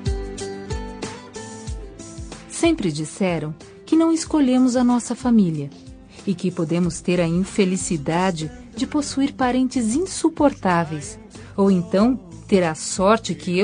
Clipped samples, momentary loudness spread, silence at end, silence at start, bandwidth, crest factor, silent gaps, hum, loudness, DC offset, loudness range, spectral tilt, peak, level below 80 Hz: under 0.1%; 16 LU; 0 s; 0 s; 10 kHz; 18 dB; none; none; -21 LUFS; under 0.1%; 4 LU; -5.5 dB/octave; -2 dBFS; -40 dBFS